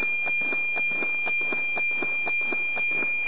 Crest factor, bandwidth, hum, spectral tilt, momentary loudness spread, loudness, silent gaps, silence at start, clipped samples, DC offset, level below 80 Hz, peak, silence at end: 10 dB; 4 kHz; none; -0.5 dB/octave; 1 LU; -23 LUFS; none; 0 s; under 0.1%; 2%; -80 dBFS; -16 dBFS; 0 s